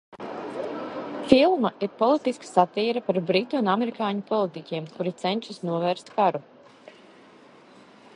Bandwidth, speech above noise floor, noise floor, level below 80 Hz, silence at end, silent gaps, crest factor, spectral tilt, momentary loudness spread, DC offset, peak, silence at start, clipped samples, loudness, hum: 11 kHz; 27 dB; -51 dBFS; -66 dBFS; 1.75 s; none; 24 dB; -6 dB/octave; 13 LU; under 0.1%; 0 dBFS; 0.1 s; under 0.1%; -25 LUFS; none